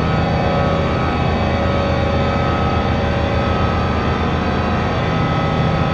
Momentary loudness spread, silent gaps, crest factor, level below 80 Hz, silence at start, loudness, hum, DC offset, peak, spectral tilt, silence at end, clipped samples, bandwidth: 1 LU; none; 12 dB; -26 dBFS; 0 s; -17 LUFS; none; under 0.1%; -4 dBFS; -7.5 dB/octave; 0 s; under 0.1%; 8 kHz